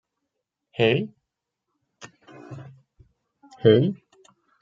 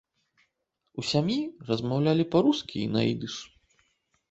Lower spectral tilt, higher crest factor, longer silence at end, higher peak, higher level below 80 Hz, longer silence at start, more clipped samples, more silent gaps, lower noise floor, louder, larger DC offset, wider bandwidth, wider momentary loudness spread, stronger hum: about the same, -7.5 dB/octave vs -6.5 dB/octave; about the same, 24 dB vs 20 dB; second, 0.7 s vs 0.85 s; first, -2 dBFS vs -10 dBFS; about the same, -64 dBFS vs -62 dBFS; second, 0.8 s vs 0.95 s; neither; neither; first, -82 dBFS vs -78 dBFS; first, -21 LUFS vs -27 LUFS; neither; second, 7.4 kHz vs 8.2 kHz; first, 24 LU vs 12 LU; neither